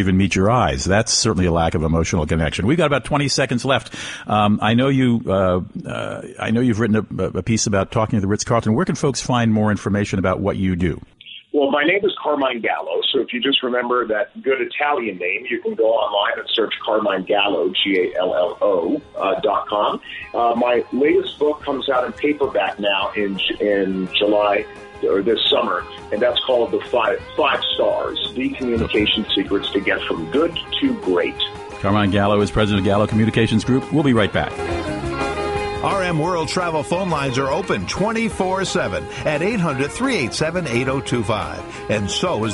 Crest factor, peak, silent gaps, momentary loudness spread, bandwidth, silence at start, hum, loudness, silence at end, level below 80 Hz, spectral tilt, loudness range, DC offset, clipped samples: 16 dB; -4 dBFS; none; 6 LU; 11.5 kHz; 0 s; none; -19 LUFS; 0 s; -40 dBFS; -5 dB/octave; 3 LU; under 0.1%; under 0.1%